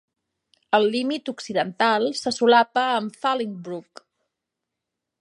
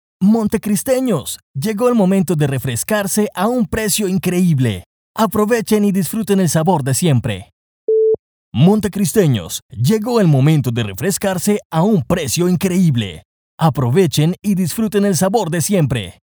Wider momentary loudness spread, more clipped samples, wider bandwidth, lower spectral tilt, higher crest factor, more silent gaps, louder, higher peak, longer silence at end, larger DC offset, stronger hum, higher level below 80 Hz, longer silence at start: first, 13 LU vs 7 LU; neither; second, 11.5 kHz vs over 20 kHz; second, -4 dB/octave vs -6 dB/octave; first, 20 dB vs 14 dB; second, none vs 1.43-1.54 s, 4.86-5.14 s, 7.53-7.88 s, 8.19-8.52 s, 9.62-9.69 s, 11.65-11.70 s, 13.25-13.58 s; second, -22 LUFS vs -16 LUFS; second, -4 dBFS vs 0 dBFS; first, 1.4 s vs 0.3 s; neither; neither; second, -76 dBFS vs -46 dBFS; first, 0.7 s vs 0.2 s